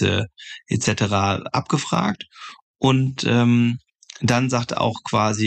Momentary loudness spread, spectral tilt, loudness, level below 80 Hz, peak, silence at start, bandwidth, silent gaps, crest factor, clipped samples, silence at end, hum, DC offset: 14 LU; -5.5 dB/octave; -21 LUFS; -54 dBFS; -6 dBFS; 0 s; 9.2 kHz; 2.62-2.74 s; 14 dB; under 0.1%; 0 s; none; under 0.1%